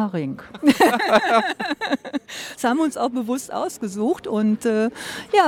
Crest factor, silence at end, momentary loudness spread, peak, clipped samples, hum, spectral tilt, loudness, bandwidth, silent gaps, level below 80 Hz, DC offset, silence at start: 18 dB; 0 s; 12 LU; -2 dBFS; under 0.1%; none; -4.5 dB/octave; -21 LUFS; 17.5 kHz; none; -62 dBFS; under 0.1%; 0 s